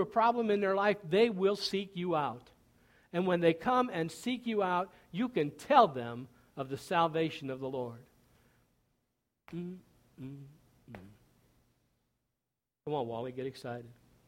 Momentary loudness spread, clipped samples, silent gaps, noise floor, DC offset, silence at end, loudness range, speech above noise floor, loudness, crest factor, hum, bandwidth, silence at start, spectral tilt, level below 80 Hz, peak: 19 LU; under 0.1%; none; -89 dBFS; under 0.1%; 0.35 s; 19 LU; 57 dB; -32 LUFS; 24 dB; none; 16.5 kHz; 0 s; -6 dB/octave; -72 dBFS; -10 dBFS